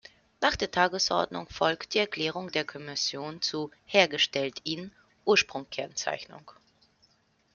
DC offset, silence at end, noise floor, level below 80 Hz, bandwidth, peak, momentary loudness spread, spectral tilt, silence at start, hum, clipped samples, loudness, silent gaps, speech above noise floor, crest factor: under 0.1%; 1 s; -68 dBFS; -60 dBFS; 7.4 kHz; -6 dBFS; 11 LU; -2.5 dB/octave; 0.4 s; none; under 0.1%; -28 LUFS; none; 38 dB; 26 dB